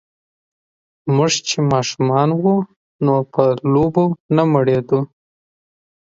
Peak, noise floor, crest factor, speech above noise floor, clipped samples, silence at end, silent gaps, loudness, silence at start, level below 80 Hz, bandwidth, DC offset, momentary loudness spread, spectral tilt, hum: 0 dBFS; under -90 dBFS; 18 dB; over 74 dB; under 0.1%; 1 s; 2.76-2.99 s, 4.20-4.29 s; -17 LUFS; 1.05 s; -52 dBFS; 7.8 kHz; under 0.1%; 5 LU; -6 dB/octave; none